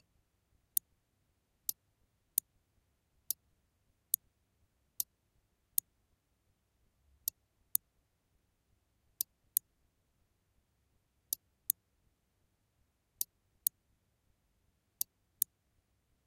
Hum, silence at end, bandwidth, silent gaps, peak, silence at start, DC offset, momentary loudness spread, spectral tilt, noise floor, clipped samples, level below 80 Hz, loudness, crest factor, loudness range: none; 3 s; 15.5 kHz; none; -6 dBFS; 1.7 s; under 0.1%; 5 LU; 1.5 dB/octave; -78 dBFS; under 0.1%; -80 dBFS; -38 LUFS; 40 dB; 3 LU